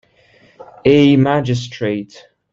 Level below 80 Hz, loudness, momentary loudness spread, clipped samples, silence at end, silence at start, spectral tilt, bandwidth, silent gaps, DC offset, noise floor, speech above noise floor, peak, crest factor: -50 dBFS; -15 LUFS; 13 LU; under 0.1%; 0.35 s; 0.85 s; -7 dB/octave; 7.6 kHz; none; under 0.1%; -51 dBFS; 37 dB; -2 dBFS; 16 dB